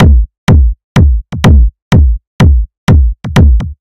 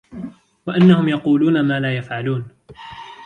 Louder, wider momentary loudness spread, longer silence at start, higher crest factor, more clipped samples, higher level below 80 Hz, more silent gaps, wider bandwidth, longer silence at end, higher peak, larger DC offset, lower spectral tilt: first, -9 LUFS vs -17 LUFS; second, 3 LU vs 22 LU; about the same, 0 s vs 0.1 s; second, 6 dB vs 16 dB; first, 1% vs under 0.1%; first, -8 dBFS vs -56 dBFS; first, 0.38-0.47 s, 0.84-0.95 s, 1.82-1.91 s, 2.27-2.39 s, 2.77-2.87 s vs none; first, 10 kHz vs 4.8 kHz; about the same, 0.1 s vs 0 s; about the same, 0 dBFS vs -2 dBFS; neither; about the same, -7.5 dB/octave vs -8.5 dB/octave